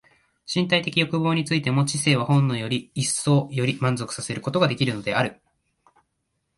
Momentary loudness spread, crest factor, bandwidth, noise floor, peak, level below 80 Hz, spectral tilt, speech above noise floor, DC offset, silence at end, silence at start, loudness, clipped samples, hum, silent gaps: 7 LU; 18 dB; 11.5 kHz; -75 dBFS; -6 dBFS; -60 dBFS; -5 dB/octave; 53 dB; under 0.1%; 1.25 s; 0.5 s; -23 LUFS; under 0.1%; none; none